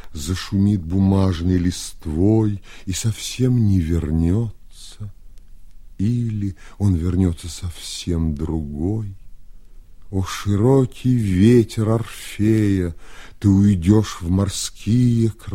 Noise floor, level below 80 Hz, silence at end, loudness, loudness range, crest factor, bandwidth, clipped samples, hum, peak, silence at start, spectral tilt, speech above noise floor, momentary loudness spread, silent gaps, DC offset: -38 dBFS; -36 dBFS; 0 s; -20 LUFS; 6 LU; 18 dB; 15.5 kHz; under 0.1%; none; -2 dBFS; 0.05 s; -7 dB/octave; 20 dB; 13 LU; none; under 0.1%